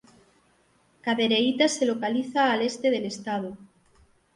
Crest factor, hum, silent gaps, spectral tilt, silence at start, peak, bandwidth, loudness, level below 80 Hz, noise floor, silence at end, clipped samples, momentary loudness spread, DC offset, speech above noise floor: 18 dB; none; none; -3.5 dB/octave; 1.05 s; -10 dBFS; 11.5 kHz; -25 LUFS; -70 dBFS; -64 dBFS; 0.7 s; under 0.1%; 10 LU; under 0.1%; 39 dB